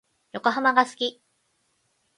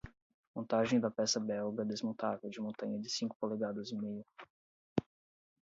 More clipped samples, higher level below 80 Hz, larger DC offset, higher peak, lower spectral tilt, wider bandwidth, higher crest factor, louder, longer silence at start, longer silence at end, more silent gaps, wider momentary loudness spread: neither; second, -80 dBFS vs -70 dBFS; neither; first, -2 dBFS vs -16 dBFS; second, -3 dB/octave vs -4.5 dB/octave; first, 11.5 kHz vs 7.4 kHz; about the same, 24 dB vs 22 dB; first, -23 LUFS vs -37 LUFS; first, 0.35 s vs 0.05 s; first, 1.05 s vs 0.75 s; second, none vs 0.22-0.54 s, 3.35-3.40 s, 4.50-4.96 s; second, 10 LU vs 14 LU